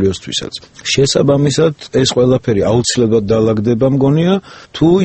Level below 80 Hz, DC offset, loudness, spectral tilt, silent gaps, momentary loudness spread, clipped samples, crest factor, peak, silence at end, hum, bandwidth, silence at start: -40 dBFS; under 0.1%; -13 LUFS; -5.5 dB/octave; none; 8 LU; under 0.1%; 12 dB; 0 dBFS; 0 s; none; 8.8 kHz; 0 s